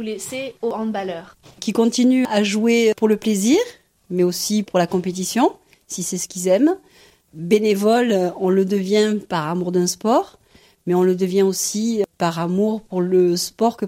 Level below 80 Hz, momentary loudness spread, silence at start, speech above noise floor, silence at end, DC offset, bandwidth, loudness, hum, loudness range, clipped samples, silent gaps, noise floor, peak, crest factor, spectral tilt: -62 dBFS; 10 LU; 0 s; 33 dB; 0 s; under 0.1%; 16.5 kHz; -19 LUFS; none; 2 LU; under 0.1%; none; -52 dBFS; -4 dBFS; 16 dB; -5 dB/octave